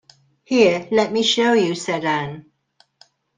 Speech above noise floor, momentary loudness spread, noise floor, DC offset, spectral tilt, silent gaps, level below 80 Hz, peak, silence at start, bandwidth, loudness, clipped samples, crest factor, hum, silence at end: 43 dB; 8 LU; -61 dBFS; under 0.1%; -4 dB/octave; none; -62 dBFS; -2 dBFS; 0.5 s; 9.8 kHz; -18 LUFS; under 0.1%; 18 dB; none; 1 s